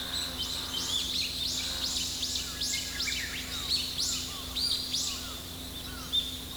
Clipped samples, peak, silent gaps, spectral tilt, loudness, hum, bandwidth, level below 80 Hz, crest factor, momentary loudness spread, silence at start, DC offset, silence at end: under 0.1%; -16 dBFS; none; -1 dB/octave; -30 LUFS; none; over 20 kHz; -48 dBFS; 16 dB; 7 LU; 0 s; under 0.1%; 0 s